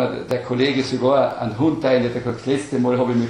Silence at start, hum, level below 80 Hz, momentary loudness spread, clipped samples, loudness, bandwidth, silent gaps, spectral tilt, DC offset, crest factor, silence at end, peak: 0 s; none; -54 dBFS; 6 LU; under 0.1%; -20 LUFS; 11 kHz; none; -6.5 dB/octave; under 0.1%; 14 dB; 0 s; -4 dBFS